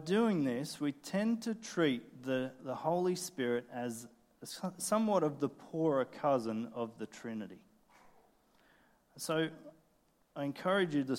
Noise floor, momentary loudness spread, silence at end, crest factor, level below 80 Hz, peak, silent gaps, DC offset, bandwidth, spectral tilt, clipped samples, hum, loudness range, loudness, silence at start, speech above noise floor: -72 dBFS; 13 LU; 0 s; 18 dB; -80 dBFS; -18 dBFS; none; under 0.1%; 16.5 kHz; -5 dB/octave; under 0.1%; none; 8 LU; -36 LUFS; 0 s; 37 dB